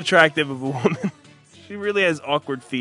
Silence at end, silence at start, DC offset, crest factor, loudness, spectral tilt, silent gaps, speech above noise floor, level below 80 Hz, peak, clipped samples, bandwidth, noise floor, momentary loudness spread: 0 s; 0 s; under 0.1%; 22 dB; -21 LUFS; -5 dB/octave; none; 28 dB; -70 dBFS; 0 dBFS; under 0.1%; 11 kHz; -49 dBFS; 13 LU